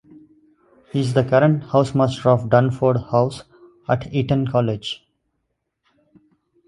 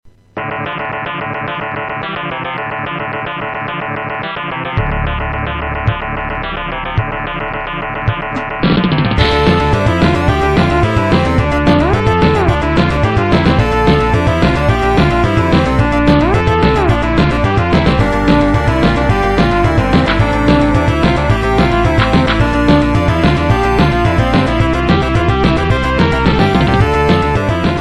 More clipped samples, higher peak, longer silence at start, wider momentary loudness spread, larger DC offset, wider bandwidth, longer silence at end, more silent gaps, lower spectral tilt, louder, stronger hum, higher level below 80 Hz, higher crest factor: neither; about the same, 0 dBFS vs 0 dBFS; first, 0.95 s vs 0.05 s; first, 11 LU vs 8 LU; neither; about the same, 11 kHz vs 12 kHz; first, 1.7 s vs 0 s; neither; about the same, -7.5 dB/octave vs -7 dB/octave; second, -19 LUFS vs -13 LUFS; neither; second, -52 dBFS vs -22 dBFS; first, 20 dB vs 12 dB